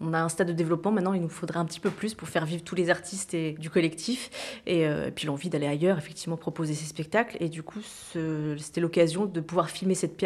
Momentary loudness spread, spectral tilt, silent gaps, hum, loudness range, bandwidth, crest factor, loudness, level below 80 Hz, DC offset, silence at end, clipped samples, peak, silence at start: 8 LU; -5.5 dB/octave; none; none; 2 LU; 14 kHz; 20 dB; -29 LUFS; -64 dBFS; under 0.1%; 0 s; under 0.1%; -10 dBFS; 0 s